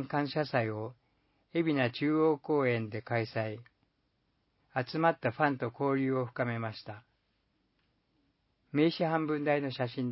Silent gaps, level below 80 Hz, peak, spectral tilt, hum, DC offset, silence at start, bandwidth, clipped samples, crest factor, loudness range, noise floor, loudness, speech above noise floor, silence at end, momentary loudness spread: none; -74 dBFS; -12 dBFS; -5.5 dB/octave; none; under 0.1%; 0 s; 5.6 kHz; under 0.1%; 22 dB; 4 LU; -77 dBFS; -32 LUFS; 45 dB; 0 s; 11 LU